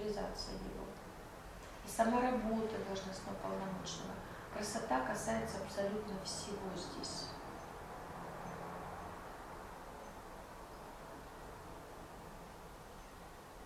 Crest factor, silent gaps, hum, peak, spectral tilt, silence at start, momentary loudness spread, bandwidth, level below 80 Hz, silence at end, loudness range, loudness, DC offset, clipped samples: 22 dB; none; none; -20 dBFS; -4.5 dB/octave; 0 s; 15 LU; 16 kHz; -58 dBFS; 0 s; 12 LU; -43 LUFS; under 0.1%; under 0.1%